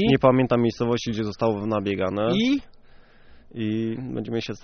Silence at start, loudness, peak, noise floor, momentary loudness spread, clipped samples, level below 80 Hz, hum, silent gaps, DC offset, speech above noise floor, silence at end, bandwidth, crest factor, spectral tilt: 0 s; -24 LUFS; -4 dBFS; -49 dBFS; 10 LU; under 0.1%; -50 dBFS; none; none; under 0.1%; 26 dB; 0.05 s; 6.6 kHz; 20 dB; -5.5 dB/octave